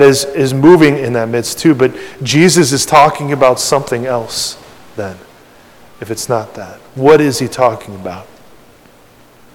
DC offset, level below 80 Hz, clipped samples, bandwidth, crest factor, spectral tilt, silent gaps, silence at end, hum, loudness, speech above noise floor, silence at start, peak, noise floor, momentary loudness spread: under 0.1%; -48 dBFS; 2%; 17 kHz; 12 dB; -4.5 dB/octave; none; 1.3 s; none; -11 LUFS; 32 dB; 0 s; 0 dBFS; -43 dBFS; 19 LU